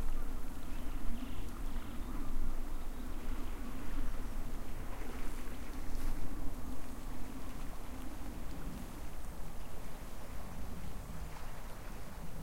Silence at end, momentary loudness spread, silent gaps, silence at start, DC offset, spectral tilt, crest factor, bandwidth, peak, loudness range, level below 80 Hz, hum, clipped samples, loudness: 0 s; 5 LU; none; 0 s; under 0.1%; -5.5 dB/octave; 14 dB; 16 kHz; -20 dBFS; 3 LU; -38 dBFS; none; under 0.1%; -47 LUFS